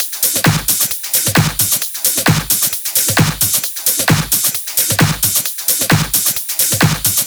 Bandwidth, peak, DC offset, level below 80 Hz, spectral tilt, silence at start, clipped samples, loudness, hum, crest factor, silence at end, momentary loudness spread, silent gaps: over 20 kHz; 0 dBFS; under 0.1%; -38 dBFS; -2.5 dB/octave; 0 s; under 0.1%; -13 LUFS; none; 14 dB; 0 s; 2 LU; none